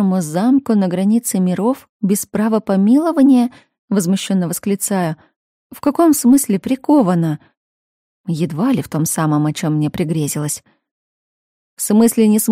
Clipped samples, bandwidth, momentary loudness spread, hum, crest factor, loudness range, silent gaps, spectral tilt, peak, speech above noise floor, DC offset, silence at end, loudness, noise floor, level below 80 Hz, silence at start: under 0.1%; 16 kHz; 9 LU; none; 12 dB; 4 LU; 1.89-2.00 s, 3.79-3.88 s, 5.36-5.70 s, 7.57-8.24 s, 10.91-11.77 s; -6 dB/octave; -2 dBFS; over 75 dB; under 0.1%; 0 s; -16 LUFS; under -90 dBFS; -56 dBFS; 0 s